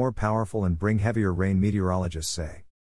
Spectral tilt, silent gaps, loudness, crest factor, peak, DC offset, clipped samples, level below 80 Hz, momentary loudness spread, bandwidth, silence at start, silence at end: -6.5 dB/octave; none; -26 LUFS; 16 dB; -10 dBFS; 0.4%; under 0.1%; -44 dBFS; 6 LU; 12 kHz; 0 s; 0.35 s